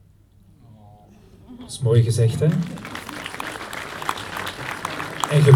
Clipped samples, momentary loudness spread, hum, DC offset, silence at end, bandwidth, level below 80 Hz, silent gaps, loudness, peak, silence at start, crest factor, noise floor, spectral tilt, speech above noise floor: under 0.1%; 15 LU; none; under 0.1%; 0 s; 16.5 kHz; -52 dBFS; none; -23 LUFS; 0 dBFS; 1.5 s; 22 dB; -52 dBFS; -6 dB/octave; 33 dB